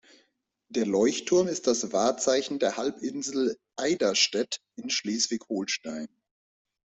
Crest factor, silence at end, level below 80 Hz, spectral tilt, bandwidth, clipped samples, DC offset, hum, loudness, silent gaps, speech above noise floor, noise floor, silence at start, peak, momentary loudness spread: 18 dB; 0.8 s; -70 dBFS; -2.5 dB/octave; 8.4 kHz; under 0.1%; under 0.1%; none; -27 LUFS; none; 45 dB; -73 dBFS; 0.7 s; -10 dBFS; 9 LU